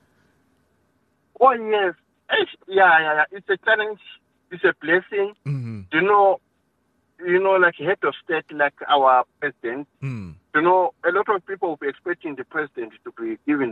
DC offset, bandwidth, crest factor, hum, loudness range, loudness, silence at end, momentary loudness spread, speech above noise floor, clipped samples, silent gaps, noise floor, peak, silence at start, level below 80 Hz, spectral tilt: under 0.1%; 4.5 kHz; 18 dB; none; 4 LU; -21 LUFS; 0 s; 15 LU; 47 dB; under 0.1%; none; -68 dBFS; -4 dBFS; 1.4 s; -68 dBFS; -7.5 dB/octave